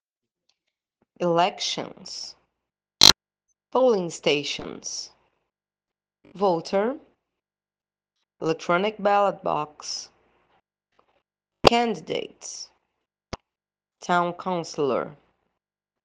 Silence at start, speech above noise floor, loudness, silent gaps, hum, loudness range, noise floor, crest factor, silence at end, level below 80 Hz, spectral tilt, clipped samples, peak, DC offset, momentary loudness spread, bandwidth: 1.2 s; over 65 dB; -23 LUFS; none; none; 9 LU; under -90 dBFS; 26 dB; 0.9 s; -54 dBFS; -2.5 dB/octave; under 0.1%; 0 dBFS; under 0.1%; 19 LU; 10.5 kHz